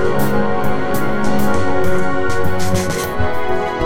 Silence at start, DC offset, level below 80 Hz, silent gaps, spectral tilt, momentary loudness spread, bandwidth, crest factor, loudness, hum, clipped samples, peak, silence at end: 0 s; 20%; -32 dBFS; none; -5.5 dB/octave; 3 LU; 17 kHz; 14 dB; -19 LUFS; none; under 0.1%; -2 dBFS; 0 s